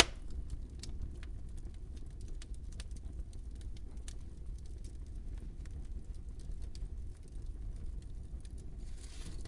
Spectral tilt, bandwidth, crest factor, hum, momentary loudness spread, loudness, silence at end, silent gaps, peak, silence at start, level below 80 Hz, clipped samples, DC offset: -5 dB/octave; 11.5 kHz; 38 dB; none; 3 LU; -46 LUFS; 0 s; none; -4 dBFS; 0 s; -44 dBFS; under 0.1%; under 0.1%